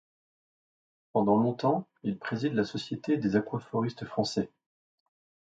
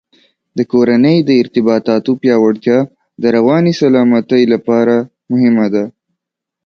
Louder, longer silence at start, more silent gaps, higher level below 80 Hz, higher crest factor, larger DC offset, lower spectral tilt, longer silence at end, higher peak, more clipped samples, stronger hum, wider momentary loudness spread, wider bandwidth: second, -30 LUFS vs -12 LUFS; first, 1.15 s vs 0.55 s; neither; second, -66 dBFS vs -58 dBFS; first, 20 dB vs 12 dB; neither; about the same, -6.5 dB/octave vs -7.5 dB/octave; first, 1 s vs 0.75 s; second, -12 dBFS vs 0 dBFS; neither; neither; about the same, 9 LU vs 8 LU; first, 9 kHz vs 6.8 kHz